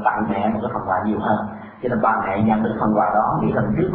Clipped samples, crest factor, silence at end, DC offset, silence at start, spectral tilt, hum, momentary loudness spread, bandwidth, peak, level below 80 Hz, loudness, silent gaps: under 0.1%; 16 dB; 0 s; under 0.1%; 0 s; -12.5 dB/octave; none; 6 LU; 4 kHz; -4 dBFS; -46 dBFS; -20 LUFS; none